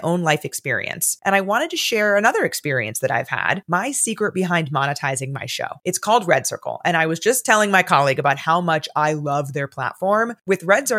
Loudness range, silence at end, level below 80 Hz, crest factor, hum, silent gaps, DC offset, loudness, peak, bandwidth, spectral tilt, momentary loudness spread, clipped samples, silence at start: 3 LU; 0 s; -72 dBFS; 18 dB; none; none; under 0.1%; -19 LUFS; -2 dBFS; 16.5 kHz; -3.5 dB/octave; 8 LU; under 0.1%; 0 s